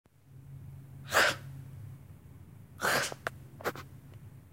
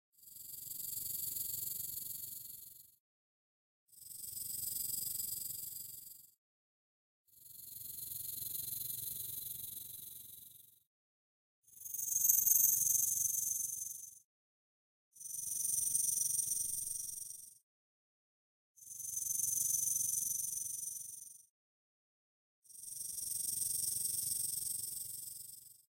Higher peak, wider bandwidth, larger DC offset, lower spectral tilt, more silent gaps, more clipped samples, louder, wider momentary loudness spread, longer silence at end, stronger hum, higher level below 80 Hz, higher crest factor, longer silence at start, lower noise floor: first, -10 dBFS vs -14 dBFS; about the same, 16 kHz vs 16.5 kHz; neither; first, -2.5 dB/octave vs 1 dB/octave; second, none vs 3.00-3.87 s, 6.38-7.25 s, 10.87-11.62 s, 14.24-15.12 s, 17.63-18.75 s, 21.50-22.62 s; neither; first, -31 LUFS vs -36 LUFS; first, 26 LU vs 19 LU; second, 0.05 s vs 0.25 s; neither; first, -64 dBFS vs -76 dBFS; about the same, 26 dB vs 28 dB; about the same, 0.3 s vs 0.2 s; second, -53 dBFS vs -59 dBFS